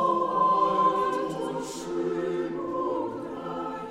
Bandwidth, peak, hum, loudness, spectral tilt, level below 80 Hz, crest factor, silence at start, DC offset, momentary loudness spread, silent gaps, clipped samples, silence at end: 13.5 kHz; -12 dBFS; none; -27 LUFS; -5.5 dB/octave; -62 dBFS; 16 dB; 0 s; under 0.1%; 11 LU; none; under 0.1%; 0 s